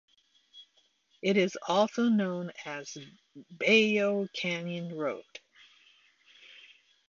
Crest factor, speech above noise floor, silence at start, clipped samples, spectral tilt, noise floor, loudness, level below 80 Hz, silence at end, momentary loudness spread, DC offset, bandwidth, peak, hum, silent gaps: 20 dB; 40 dB; 0.55 s; under 0.1%; -5 dB/octave; -70 dBFS; -29 LUFS; -80 dBFS; 0.55 s; 25 LU; under 0.1%; 7.4 kHz; -12 dBFS; none; none